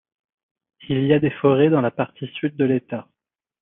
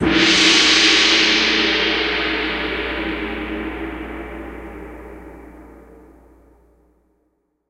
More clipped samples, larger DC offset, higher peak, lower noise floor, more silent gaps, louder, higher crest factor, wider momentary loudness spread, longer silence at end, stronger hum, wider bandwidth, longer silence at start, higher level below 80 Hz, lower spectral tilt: neither; neither; second, -4 dBFS vs 0 dBFS; first, -85 dBFS vs -67 dBFS; neither; second, -20 LUFS vs -15 LUFS; about the same, 18 dB vs 20 dB; second, 11 LU vs 24 LU; second, 0.6 s vs 1.9 s; neither; second, 3.9 kHz vs 12.5 kHz; first, 0.9 s vs 0 s; second, -64 dBFS vs -40 dBFS; first, -11 dB/octave vs -2 dB/octave